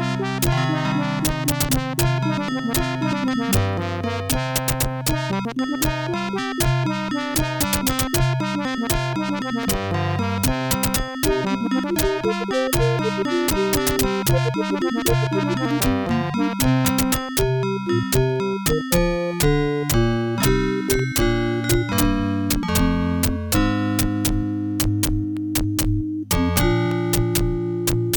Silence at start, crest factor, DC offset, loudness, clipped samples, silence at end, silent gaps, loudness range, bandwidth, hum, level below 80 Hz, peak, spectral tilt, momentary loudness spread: 0 s; 18 dB; under 0.1%; -21 LUFS; under 0.1%; 0 s; none; 2 LU; 19 kHz; none; -32 dBFS; -4 dBFS; -5 dB/octave; 4 LU